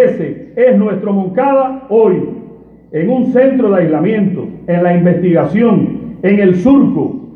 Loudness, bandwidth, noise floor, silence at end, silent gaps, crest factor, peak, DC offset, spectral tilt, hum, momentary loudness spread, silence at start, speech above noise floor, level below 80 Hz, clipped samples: -12 LUFS; 6.4 kHz; -36 dBFS; 0 s; none; 12 dB; 0 dBFS; under 0.1%; -10.5 dB/octave; none; 9 LU; 0 s; 25 dB; -48 dBFS; under 0.1%